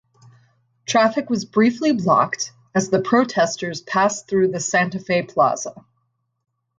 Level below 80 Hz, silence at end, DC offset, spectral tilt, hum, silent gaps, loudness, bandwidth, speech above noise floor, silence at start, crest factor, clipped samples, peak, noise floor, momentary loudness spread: -62 dBFS; 1 s; under 0.1%; -4.5 dB/octave; none; none; -20 LUFS; 9.4 kHz; 51 dB; 0.9 s; 18 dB; under 0.1%; -2 dBFS; -71 dBFS; 6 LU